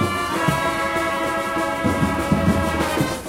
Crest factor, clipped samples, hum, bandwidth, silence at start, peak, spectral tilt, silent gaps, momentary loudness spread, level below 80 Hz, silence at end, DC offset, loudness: 16 dB; under 0.1%; none; 16 kHz; 0 s; -6 dBFS; -5 dB/octave; none; 3 LU; -38 dBFS; 0 s; under 0.1%; -21 LUFS